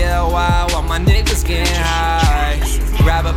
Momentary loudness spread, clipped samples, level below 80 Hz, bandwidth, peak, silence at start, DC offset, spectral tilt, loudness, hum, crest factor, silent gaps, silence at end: 3 LU; under 0.1%; -16 dBFS; 16.5 kHz; -2 dBFS; 0 s; under 0.1%; -4.5 dB/octave; -16 LUFS; none; 12 dB; none; 0 s